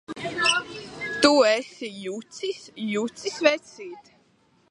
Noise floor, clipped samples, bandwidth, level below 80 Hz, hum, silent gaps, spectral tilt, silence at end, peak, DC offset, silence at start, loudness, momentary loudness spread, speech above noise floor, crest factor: -63 dBFS; under 0.1%; 11.5 kHz; -66 dBFS; none; none; -2.5 dB/octave; 0.7 s; -2 dBFS; under 0.1%; 0.1 s; -24 LUFS; 17 LU; 38 dB; 24 dB